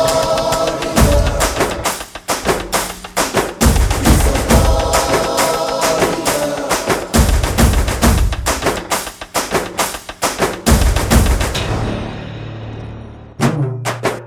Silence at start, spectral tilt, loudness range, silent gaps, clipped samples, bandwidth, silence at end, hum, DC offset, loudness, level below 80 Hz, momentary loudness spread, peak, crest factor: 0 s; -4.5 dB/octave; 3 LU; none; under 0.1%; 19 kHz; 0 s; none; under 0.1%; -16 LUFS; -20 dBFS; 8 LU; 0 dBFS; 16 dB